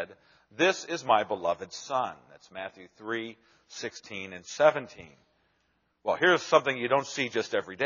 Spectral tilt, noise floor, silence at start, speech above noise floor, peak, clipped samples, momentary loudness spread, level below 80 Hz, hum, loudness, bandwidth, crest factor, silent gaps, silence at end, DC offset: -2 dB/octave; -73 dBFS; 0 s; 44 dB; -6 dBFS; under 0.1%; 18 LU; -74 dBFS; none; -28 LUFS; 7.2 kHz; 24 dB; none; 0 s; under 0.1%